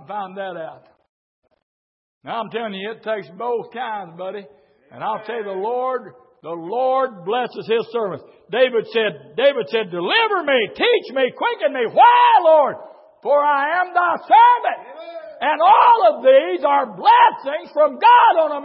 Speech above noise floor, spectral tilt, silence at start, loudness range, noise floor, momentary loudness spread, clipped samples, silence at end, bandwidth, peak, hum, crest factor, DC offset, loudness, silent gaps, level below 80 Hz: over 73 dB; -8.5 dB/octave; 0.1 s; 13 LU; under -90 dBFS; 18 LU; under 0.1%; 0 s; 5.8 kHz; -2 dBFS; none; 16 dB; under 0.1%; -17 LUFS; 1.09-1.42 s, 1.63-2.21 s; -76 dBFS